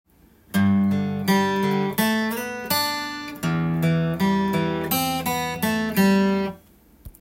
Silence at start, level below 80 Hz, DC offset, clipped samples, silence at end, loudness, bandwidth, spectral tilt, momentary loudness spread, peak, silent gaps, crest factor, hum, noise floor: 0.55 s; -54 dBFS; under 0.1%; under 0.1%; 0.1 s; -22 LUFS; 17 kHz; -5.5 dB/octave; 7 LU; -6 dBFS; none; 16 dB; none; -52 dBFS